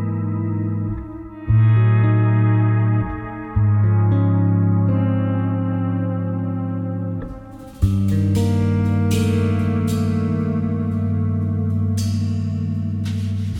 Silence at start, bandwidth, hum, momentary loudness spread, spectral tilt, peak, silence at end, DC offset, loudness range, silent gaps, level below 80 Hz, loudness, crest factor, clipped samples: 0 s; 10.5 kHz; none; 9 LU; -8.5 dB/octave; -4 dBFS; 0 s; under 0.1%; 4 LU; none; -40 dBFS; -20 LUFS; 14 dB; under 0.1%